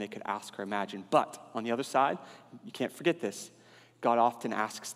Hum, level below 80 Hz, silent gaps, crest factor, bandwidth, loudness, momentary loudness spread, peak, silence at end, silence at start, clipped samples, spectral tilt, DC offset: none; -88 dBFS; none; 22 dB; 15.5 kHz; -32 LUFS; 16 LU; -10 dBFS; 0 s; 0 s; under 0.1%; -4.5 dB/octave; under 0.1%